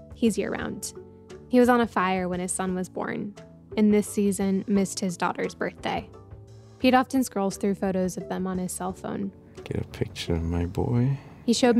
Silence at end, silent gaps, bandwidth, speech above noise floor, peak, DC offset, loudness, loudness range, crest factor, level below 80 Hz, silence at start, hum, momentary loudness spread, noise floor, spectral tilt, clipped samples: 0 s; none; 15 kHz; 21 dB; -8 dBFS; under 0.1%; -26 LUFS; 4 LU; 18 dB; -48 dBFS; 0 s; none; 13 LU; -46 dBFS; -5.5 dB/octave; under 0.1%